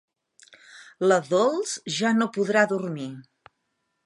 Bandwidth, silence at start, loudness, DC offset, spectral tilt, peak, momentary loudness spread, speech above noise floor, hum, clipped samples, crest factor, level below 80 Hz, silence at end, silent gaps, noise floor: 11.5 kHz; 0.75 s; -24 LUFS; under 0.1%; -4.5 dB/octave; -6 dBFS; 13 LU; 53 dB; none; under 0.1%; 20 dB; -78 dBFS; 0.85 s; none; -76 dBFS